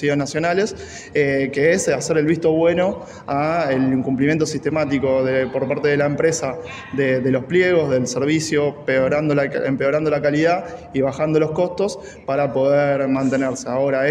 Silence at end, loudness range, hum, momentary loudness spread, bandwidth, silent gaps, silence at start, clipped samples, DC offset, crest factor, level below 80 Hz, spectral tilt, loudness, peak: 0 s; 1 LU; none; 7 LU; 12 kHz; none; 0 s; under 0.1%; under 0.1%; 14 dB; -52 dBFS; -5.5 dB/octave; -19 LUFS; -4 dBFS